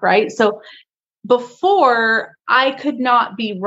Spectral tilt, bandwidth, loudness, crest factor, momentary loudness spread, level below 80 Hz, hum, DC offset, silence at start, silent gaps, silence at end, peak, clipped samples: -4.5 dB/octave; 8 kHz; -16 LUFS; 16 dB; 7 LU; -74 dBFS; none; under 0.1%; 0 s; none; 0 s; 0 dBFS; under 0.1%